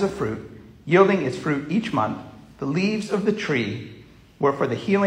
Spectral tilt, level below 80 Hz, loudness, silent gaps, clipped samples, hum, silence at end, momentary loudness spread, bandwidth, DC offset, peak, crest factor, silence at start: -6.5 dB/octave; -56 dBFS; -23 LUFS; none; under 0.1%; none; 0 s; 17 LU; 11 kHz; under 0.1%; -2 dBFS; 20 dB; 0 s